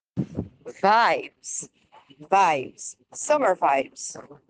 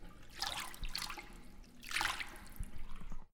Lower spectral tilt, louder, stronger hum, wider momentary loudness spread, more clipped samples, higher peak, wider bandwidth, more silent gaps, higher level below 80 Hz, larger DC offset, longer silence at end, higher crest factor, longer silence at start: first, -3.5 dB/octave vs -1.5 dB/octave; first, -23 LUFS vs -42 LUFS; neither; about the same, 17 LU vs 18 LU; neither; first, -6 dBFS vs -18 dBFS; second, 10 kHz vs 18 kHz; neither; second, -62 dBFS vs -48 dBFS; neither; about the same, 0.15 s vs 0.05 s; about the same, 20 dB vs 24 dB; first, 0.15 s vs 0 s